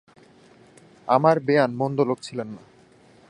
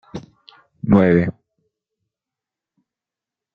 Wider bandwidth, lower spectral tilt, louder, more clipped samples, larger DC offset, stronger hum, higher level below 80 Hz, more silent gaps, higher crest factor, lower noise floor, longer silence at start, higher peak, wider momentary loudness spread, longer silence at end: first, 11 kHz vs 6.2 kHz; second, -7 dB/octave vs -9.5 dB/octave; second, -22 LUFS vs -16 LUFS; neither; neither; neither; second, -70 dBFS vs -50 dBFS; neither; about the same, 22 dB vs 20 dB; second, -54 dBFS vs -88 dBFS; first, 1.05 s vs 0.15 s; about the same, -2 dBFS vs -2 dBFS; second, 19 LU vs 23 LU; second, 0.7 s vs 2.25 s